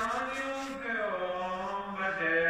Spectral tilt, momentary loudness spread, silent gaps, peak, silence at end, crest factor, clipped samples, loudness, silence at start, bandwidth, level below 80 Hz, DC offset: -4 dB/octave; 5 LU; none; -18 dBFS; 0 s; 14 dB; under 0.1%; -33 LUFS; 0 s; 15.5 kHz; -62 dBFS; under 0.1%